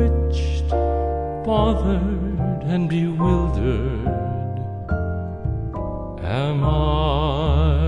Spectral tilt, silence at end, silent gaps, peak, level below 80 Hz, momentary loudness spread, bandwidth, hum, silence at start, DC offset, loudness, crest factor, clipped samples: -8.5 dB/octave; 0 s; none; -6 dBFS; -24 dBFS; 8 LU; 7.2 kHz; none; 0 s; under 0.1%; -22 LUFS; 14 dB; under 0.1%